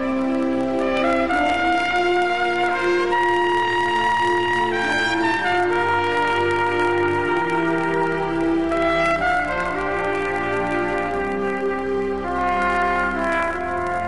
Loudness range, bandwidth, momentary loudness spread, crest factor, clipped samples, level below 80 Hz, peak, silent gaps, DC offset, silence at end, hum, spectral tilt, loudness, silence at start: 3 LU; 11.5 kHz; 4 LU; 12 dB; under 0.1%; -44 dBFS; -8 dBFS; none; 1%; 0 s; none; -5 dB/octave; -20 LUFS; 0 s